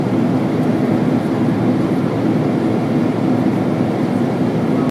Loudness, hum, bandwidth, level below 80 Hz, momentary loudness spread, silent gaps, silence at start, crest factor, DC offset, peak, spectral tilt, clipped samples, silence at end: -17 LUFS; none; 13 kHz; -50 dBFS; 1 LU; none; 0 s; 12 dB; under 0.1%; -4 dBFS; -8.5 dB/octave; under 0.1%; 0 s